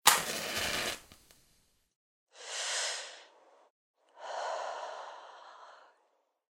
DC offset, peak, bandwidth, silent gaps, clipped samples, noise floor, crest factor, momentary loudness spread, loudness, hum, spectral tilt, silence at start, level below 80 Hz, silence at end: under 0.1%; -4 dBFS; 16 kHz; 1.96-2.27 s, 3.70-3.94 s; under 0.1%; -75 dBFS; 34 dB; 21 LU; -34 LUFS; none; 0 dB/octave; 0.05 s; -68 dBFS; 0.8 s